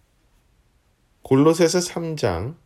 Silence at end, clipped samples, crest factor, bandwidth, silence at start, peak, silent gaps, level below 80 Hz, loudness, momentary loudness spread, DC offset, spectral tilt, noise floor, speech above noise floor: 0.1 s; under 0.1%; 18 dB; 15.5 kHz; 1.25 s; -4 dBFS; none; -50 dBFS; -20 LUFS; 8 LU; under 0.1%; -5.5 dB/octave; -62 dBFS; 43 dB